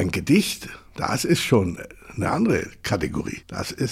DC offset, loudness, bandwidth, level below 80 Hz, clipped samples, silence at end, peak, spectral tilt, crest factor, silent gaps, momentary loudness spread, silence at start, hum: under 0.1%; -23 LUFS; 16 kHz; -46 dBFS; under 0.1%; 0 s; -4 dBFS; -5 dB/octave; 20 dB; none; 12 LU; 0 s; none